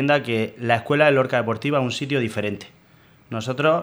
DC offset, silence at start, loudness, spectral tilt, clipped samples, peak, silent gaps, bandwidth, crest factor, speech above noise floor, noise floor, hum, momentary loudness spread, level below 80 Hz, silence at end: under 0.1%; 0 s; -21 LUFS; -6 dB/octave; under 0.1%; -2 dBFS; none; over 20 kHz; 20 dB; 32 dB; -53 dBFS; none; 12 LU; -62 dBFS; 0 s